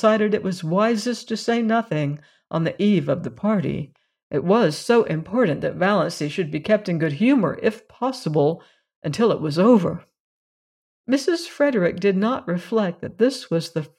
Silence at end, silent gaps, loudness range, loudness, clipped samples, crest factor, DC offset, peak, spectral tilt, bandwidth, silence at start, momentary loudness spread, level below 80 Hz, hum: 0.1 s; 4.23-4.30 s, 8.96-9.02 s, 10.20-11.04 s; 2 LU; -21 LUFS; under 0.1%; 16 dB; under 0.1%; -4 dBFS; -6.5 dB/octave; 13 kHz; 0 s; 9 LU; -60 dBFS; none